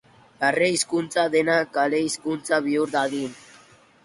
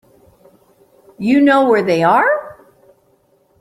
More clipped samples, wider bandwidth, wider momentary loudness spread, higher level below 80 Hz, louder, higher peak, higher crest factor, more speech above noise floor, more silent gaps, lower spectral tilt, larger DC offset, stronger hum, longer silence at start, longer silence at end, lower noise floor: neither; about the same, 11.5 kHz vs 12.5 kHz; second, 6 LU vs 9 LU; second, -68 dBFS vs -60 dBFS; second, -23 LUFS vs -13 LUFS; second, -6 dBFS vs -2 dBFS; about the same, 16 dB vs 14 dB; second, 30 dB vs 45 dB; neither; second, -3.5 dB/octave vs -6.5 dB/octave; neither; neither; second, 0.4 s vs 1.2 s; second, 0.65 s vs 1.05 s; second, -53 dBFS vs -57 dBFS